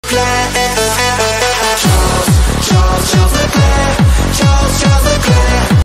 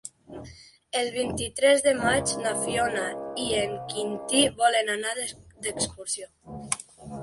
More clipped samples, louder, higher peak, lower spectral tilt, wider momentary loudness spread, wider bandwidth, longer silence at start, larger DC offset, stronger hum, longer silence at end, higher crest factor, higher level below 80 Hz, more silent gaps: neither; first, -11 LUFS vs -26 LUFS; first, 0 dBFS vs -6 dBFS; first, -4.5 dB/octave vs -2.5 dB/octave; second, 1 LU vs 20 LU; first, 16.5 kHz vs 12 kHz; about the same, 0.05 s vs 0.05 s; neither; first, 50 Hz at -30 dBFS vs none; about the same, 0 s vs 0 s; second, 10 dB vs 20 dB; first, -16 dBFS vs -54 dBFS; neither